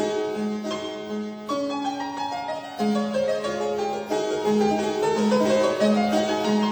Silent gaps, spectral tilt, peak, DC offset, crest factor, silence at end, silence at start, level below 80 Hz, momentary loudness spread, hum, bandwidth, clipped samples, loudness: none; -5 dB/octave; -10 dBFS; under 0.1%; 14 dB; 0 s; 0 s; -62 dBFS; 10 LU; none; over 20 kHz; under 0.1%; -24 LUFS